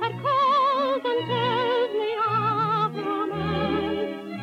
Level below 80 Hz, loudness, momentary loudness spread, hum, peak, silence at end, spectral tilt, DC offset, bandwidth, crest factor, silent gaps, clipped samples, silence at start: -54 dBFS; -24 LUFS; 7 LU; none; -12 dBFS; 0 s; -7 dB/octave; under 0.1%; 14.5 kHz; 12 dB; none; under 0.1%; 0 s